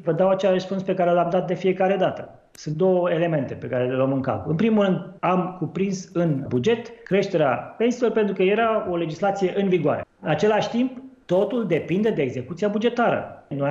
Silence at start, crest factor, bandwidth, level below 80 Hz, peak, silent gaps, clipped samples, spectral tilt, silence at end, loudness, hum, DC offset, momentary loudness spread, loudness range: 0 s; 14 dB; 8 kHz; -62 dBFS; -8 dBFS; none; under 0.1%; -7 dB/octave; 0 s; -23 LUFS; none; under 0.1%; 7 LU; 1 LU